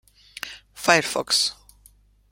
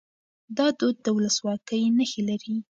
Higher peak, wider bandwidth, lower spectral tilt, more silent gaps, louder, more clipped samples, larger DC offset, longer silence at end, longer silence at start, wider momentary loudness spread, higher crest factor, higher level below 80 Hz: first, -2 dBFS vs -10 dBFS; first, 16.5 kHz vs 7.8 kHz; second, -1.5 dB/octave vs -4 dB/octave; neither; first, -21 LUFS vs -25 LUFS; neither; neither; first, 0.8 s vs 0.1 s; about the same, 0.45 s vs 0.5 s; first, 17 LU vs 6 LU; first, 24 dB vs 16 dB; first, -58 dBFS vs -72 dBFS